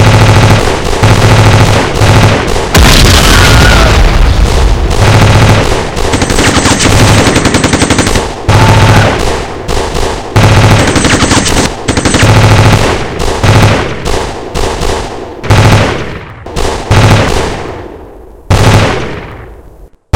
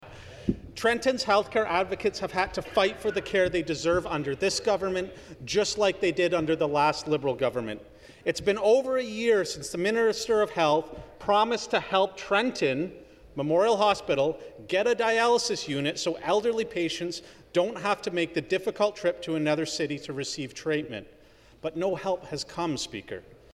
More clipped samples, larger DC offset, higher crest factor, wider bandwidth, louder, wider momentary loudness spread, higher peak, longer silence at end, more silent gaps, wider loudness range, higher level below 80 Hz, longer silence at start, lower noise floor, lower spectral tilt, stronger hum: first, 6% vs under 0.1%; first, 3% vs under 0.1%; second, 6 dB vs 18 dB; first, 17 kHz vs 13.5 kHz; first, -7 LUFS vs -27 LUFS; about the same, 11 LU vs 10 LU; first, 0 dBFS vs -10 dBFS; about the same, 0.25 s vs 0.35 s; neither; about the same, 5 LU vs 4 LU; first, -14 dBFS vs -56 dBFS; about the same, 0 s vs 0 s; second, -33 dBFS vs -55 dBFS; about the same, -4.5 dB/octave vs -4 dB/octave; neither